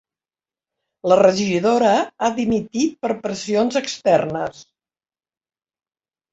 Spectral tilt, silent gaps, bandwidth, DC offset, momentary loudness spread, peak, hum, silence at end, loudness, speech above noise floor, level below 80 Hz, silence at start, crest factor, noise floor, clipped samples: -5 dB/octave; none; 8.2 kHz; under 0.1%; 10 LU; -2 dBFS; none; 1.7 s; -19 LUFS; over 72 dB; -58 dBFS; 1.05 s; 18 dB; under -90 dBFS; under 0.1%